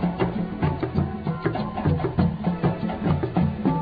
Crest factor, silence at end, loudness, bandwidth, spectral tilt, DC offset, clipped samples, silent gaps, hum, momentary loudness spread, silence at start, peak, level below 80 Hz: 16 dB; 0 s; -25 LUFS; 5 kHz; -11 dB/octave; under 0.1%; under 0.1%; none; none; 4 LU; 0 s; -8 dBFS; -40 dBFS